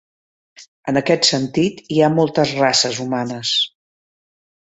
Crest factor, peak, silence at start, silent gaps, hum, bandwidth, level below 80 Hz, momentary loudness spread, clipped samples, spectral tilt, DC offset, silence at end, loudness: 18 dB; -2 dBFS; 0.6 s; 0.68-0.83 s; none; 8.4 kHz; -60 dBFS; 7 LU; under 0.1%; -4 dB/octave; under 0.1%; 1 s; -17 LUFS